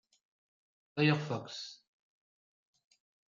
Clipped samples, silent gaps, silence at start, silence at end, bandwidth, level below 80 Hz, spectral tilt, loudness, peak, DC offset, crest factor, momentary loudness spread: under 0.1%; none; 0.95 s; 1.55 s; 7.4 kHz; -82 dBFS; -6 dB/octave; -33 LUFS; -16 dBFS; under 0.1%; 24 dB; 14 LU